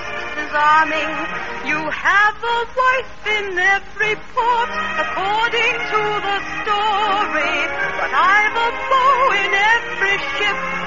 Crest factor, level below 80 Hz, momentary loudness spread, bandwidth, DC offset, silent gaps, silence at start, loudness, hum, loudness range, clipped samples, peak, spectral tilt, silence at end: 14 dB; -46 dBFS; 7 LU; 7.4 kHz; 2%; none; 0 s; -17 LUFS; none; 3 LU; under 0.1%; -4 dBFS; 0.5 dB/octave; 0 s